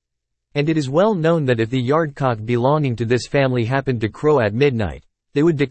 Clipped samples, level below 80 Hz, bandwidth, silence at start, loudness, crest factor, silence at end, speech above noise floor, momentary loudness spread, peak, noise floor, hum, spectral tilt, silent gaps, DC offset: under 0.1%; -48 dBFS; 8.8 kHz; 0.55 s; -19 LUFS; 14 dB; 0 s; 60 dB; 6 LU; -4 dBFS; -78 dBFS; none; -7.5 dB/octave; none; under 0.1%